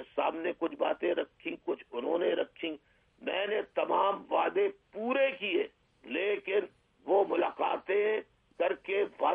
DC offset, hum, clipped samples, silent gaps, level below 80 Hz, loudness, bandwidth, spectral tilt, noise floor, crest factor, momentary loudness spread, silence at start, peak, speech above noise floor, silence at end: under 0.1%; none; under 0.1%; none; -76 dBFS; -32 LUFS; 3.8 kHz; -6.5 dB/octave; -57 dBFS; 18 dB; 10 LU; 0 s; -14 dBFS; 24 dB; 0 s